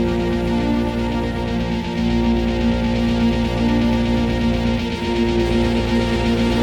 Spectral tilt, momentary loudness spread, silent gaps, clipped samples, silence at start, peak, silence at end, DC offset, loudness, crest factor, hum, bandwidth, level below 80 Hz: -7 dB/octave; 4 LU; none; under 0.1%; 0 s; -6 dBFS; 0 s; under 0.1%; -19 LUFS; 12 dB; none; 12.5 kHz; -26 dBFS